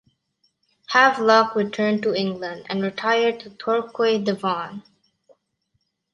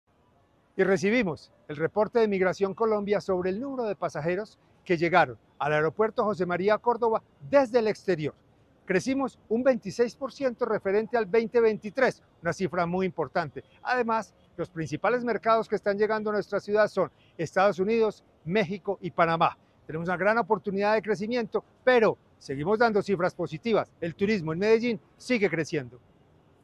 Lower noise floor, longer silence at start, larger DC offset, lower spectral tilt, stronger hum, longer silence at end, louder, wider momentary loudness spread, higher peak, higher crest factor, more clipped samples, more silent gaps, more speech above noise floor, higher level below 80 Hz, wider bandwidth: first, -73 dBFS vs -64 dBFS; first, 0.9 s vs 0.75 s; neither; about the same, -5 dB/octave vs -6 dB/octave; neither; first, 1.35 s vs 0.65 s; first, -21 LUFS vs -27 LUFS; first, 12 LU vs 9 LU; first, -2 dBFS vs -6 dBFS; about the same, 20 dB vs 20 dB; neither; neither; first, 52 dB vs 38 dB; second, -70 dBFS vs -62 dBFS; about the same, 10.5 kHz vs 11 kHz